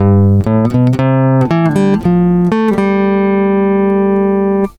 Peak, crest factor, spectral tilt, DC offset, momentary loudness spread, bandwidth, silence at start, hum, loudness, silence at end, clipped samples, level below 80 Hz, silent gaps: 0 dBFS; 10 dB; -9.5 dB/octave; under 0.1%; 2 LU; 10.5 kHz; 0 s; none; -11 LUFS; 0.05 s; under 0.1%; -38 dBFS; none